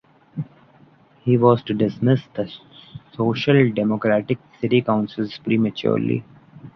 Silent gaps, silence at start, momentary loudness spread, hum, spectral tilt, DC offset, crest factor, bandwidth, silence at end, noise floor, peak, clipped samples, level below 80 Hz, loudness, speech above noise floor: none; 0.35 s; 17 LU; none; -9 dB/octave; under 0.1%; 18 dB; 6.2 kHz; 0.05 s; -52 dBFS; -2 dBFS; under 0.1%; -58 dBFS; -20 LUFS; 33 dB